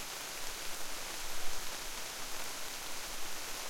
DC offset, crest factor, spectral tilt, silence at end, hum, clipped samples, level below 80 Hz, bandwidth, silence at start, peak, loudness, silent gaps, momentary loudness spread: under 0.1%; 16 dB; -0.5 dB/octave; 0 s; none; under 0.1%; -50 dBFS; 16.5 kHz; 0 s; -20 dBFS; -41 LUFS; none; 0 LU